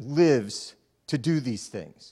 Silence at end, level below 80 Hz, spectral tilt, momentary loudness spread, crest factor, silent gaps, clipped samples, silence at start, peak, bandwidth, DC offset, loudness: 0.05 s; -68 dBFS; -6 dB/octave; 19 LU; 18 dB; none; under 0.1%; 0 s; -10 dBFS; 12 kHz; under 0.1%; -26 LUFS